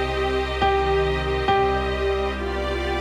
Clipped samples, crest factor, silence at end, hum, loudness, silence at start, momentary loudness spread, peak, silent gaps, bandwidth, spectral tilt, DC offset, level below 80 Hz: under 0.1%; 16 dB; 0 s; none; -22 LUFS; 0 s; 5 LU; -6 dBFS; none; 11 kHz; -6 dB/octave; under 0.1%; -30 dBFS